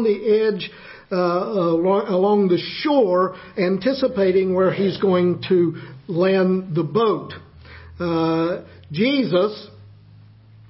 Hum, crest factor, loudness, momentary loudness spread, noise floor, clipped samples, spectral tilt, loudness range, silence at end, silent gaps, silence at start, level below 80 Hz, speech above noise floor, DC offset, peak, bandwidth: none; 14 dB; -20 LUFS; 11 LU; -47 dBFS; under 0.1%; -11 dB/octave; 3 LU; 0.85 s; none; 0 s; -54 dBFS; 27 dB; under 0.1%; -6 dBFS; 5.8 kHz